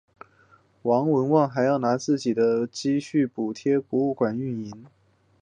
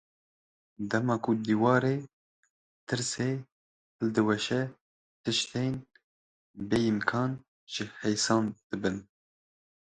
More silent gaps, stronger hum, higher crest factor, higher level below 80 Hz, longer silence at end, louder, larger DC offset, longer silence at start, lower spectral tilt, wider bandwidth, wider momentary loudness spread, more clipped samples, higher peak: second, none vs 2.13-2.43 s, 2.50-2.87 s, 3.52-3.99 s, 4.81-5.24 s, 6.04-6.54 s, 7.48-7.67 s, 8.64-8.70 s; neither; about the same, 18 dB vs 22 dB; about the same, -68 dBFS vs -64 dBFS; second, 0.55 s vs 0.85 s; first, -24 LUFS vs -30 LUFS; neither; about the same, 0.85 s vs 0.8 s; first, -6.5 dB/octave vs -5 dB/octave; about the same, 9.6 kHz vs 10 kHz; second, 9 LU vs 12 LU; neither; first, -6 dBFS vs -10 dBFS